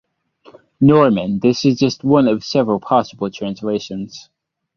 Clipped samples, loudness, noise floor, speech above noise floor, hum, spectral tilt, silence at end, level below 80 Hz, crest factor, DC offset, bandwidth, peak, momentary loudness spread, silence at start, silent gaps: under 0.1%; -16 LUFS; -50 dBFS; 34 dB; none; -7 dB/octave; 0.55 s; -54 dBFS; 16 dB; under 0.1%; 7 kHz; -2 dBFS; 12 LU; 0.8 s; none